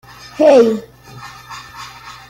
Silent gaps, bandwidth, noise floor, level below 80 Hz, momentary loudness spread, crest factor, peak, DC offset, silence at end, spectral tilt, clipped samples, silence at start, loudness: none; 16 kHz; -36 dBFS; -54 dBFS; 25 LU; 14 dB; -2 dBFS; under 0.1%; 0.2 s; -5 dB/octave; under 0.1%; 0.4 s; -12 LUFS